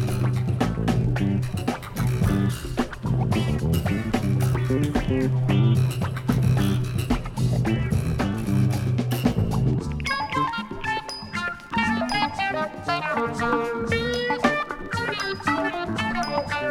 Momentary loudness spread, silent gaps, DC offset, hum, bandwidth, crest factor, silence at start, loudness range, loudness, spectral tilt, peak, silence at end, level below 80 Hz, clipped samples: 5 LU; none; under 0.1%; none; 16 kHz; 16 dB; 0 s; 3 LU; -24 LUFS; -6.5 dB/octave; -6 dBFS; 0 s; -38 dBFS; under 0.1%